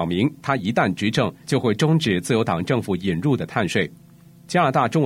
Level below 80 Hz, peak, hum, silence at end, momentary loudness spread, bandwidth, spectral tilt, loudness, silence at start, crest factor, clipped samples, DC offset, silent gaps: -54 dBFS; -4 dBFS; none; 0 s; 5 LU; 14.5 kHz; -6 dB/octave; -21 LUFS; 0 s; 18 dB; under 0.1%; under 0.1%; none